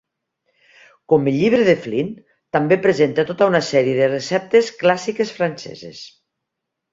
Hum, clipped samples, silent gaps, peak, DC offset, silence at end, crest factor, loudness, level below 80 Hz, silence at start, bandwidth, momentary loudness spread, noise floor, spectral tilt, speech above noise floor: none; under 0.1%; none; -2 dBFS; under 0.1%; 0.85 s; 18 dB; -18 LUFS; -60 dBFS; 1.1 s; 7.8 kHz; 13 LU; -80 dBFS; -6 dB/octave; 62 dB